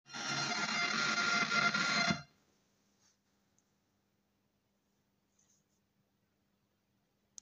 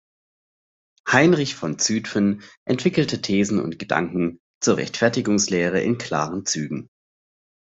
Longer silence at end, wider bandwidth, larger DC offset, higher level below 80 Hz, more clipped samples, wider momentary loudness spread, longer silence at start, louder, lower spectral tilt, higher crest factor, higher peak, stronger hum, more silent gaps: first, 5.15 s vs 0.8 s; first, 15.5 kHz vs 8.2 kHz; neither; second, -76 dBFS vs -60 dBFS; neither; about the same, 6 LU vs 8 LU; second, 0.1 s vs 1.05 s; second, -33 LUFS vs -22 LUFS; second, -2 dB/octave vs -4.5 dB/octave; about the same, 22 dB vs 20 dB; second, -18 dBFS vs -2 dBFS; neither; second, none vs 2.57-2.66 s, 4.40-4.61 s